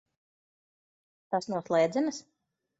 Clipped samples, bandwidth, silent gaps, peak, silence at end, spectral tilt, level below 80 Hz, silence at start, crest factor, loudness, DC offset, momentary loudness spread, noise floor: under 0.1%; 8 kHz; none; -14 dBFS; 0.6 s; -5.5 dB/octave; -78 dBFS; 1.3 s; 18 dB; -30 LUFS; under 0.1%; 8 LU; under -90 dBFS